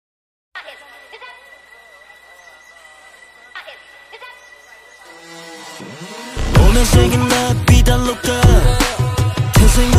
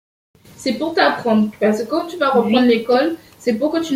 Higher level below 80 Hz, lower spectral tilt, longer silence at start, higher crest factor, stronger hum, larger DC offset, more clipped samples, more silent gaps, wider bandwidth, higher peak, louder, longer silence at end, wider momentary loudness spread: first, -20 dBFS vs -58 dBFS; about the same, -5 dB/octave vs -5.5 dB/octave; about the same, 0.55 s vs 0.6 s; about the same, 16 dB vs 16 dB; neither; neither; neither; neither; about the same, 15.5 kHz vs 16 kHz; about the same, 0 dBFS vs -2 dBFS; first, -14 LUFS vs -17 LUFS; about the same, 0 s vs 0 s; first, 24 LU vs 8 LU